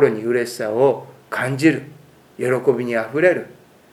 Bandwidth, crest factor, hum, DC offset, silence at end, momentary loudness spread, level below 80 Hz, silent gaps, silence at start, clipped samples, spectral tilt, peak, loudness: 15.5 kHz; 18 dB; none; under 0.1%; 0.4 s; 10 LU; -70 dBFS; none; 0 s; under 0.1%; -6 dB/octave; -2 dBFS; -20 LUFS